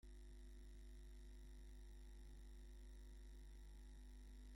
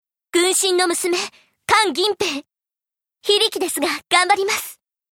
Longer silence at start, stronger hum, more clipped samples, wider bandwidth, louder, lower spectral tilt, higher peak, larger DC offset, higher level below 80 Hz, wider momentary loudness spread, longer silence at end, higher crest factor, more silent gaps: second, 0.05 s vs 0.35 s; neither; neither; about the same, 16.5 kHz vs 17.5 kHz; second, -63 LUFS vs -18 LUFS; first, -5.5 dB/octave vs -0.5 dB/octave; second, -50 dBFS vs 0 dBFS; neither; about the same, -58 dBFS vs -62 dBFS; second, 0 LU vs 12 LU; second, 0 s vs 0.4 s; second, 8 dB vs 20 dB; neither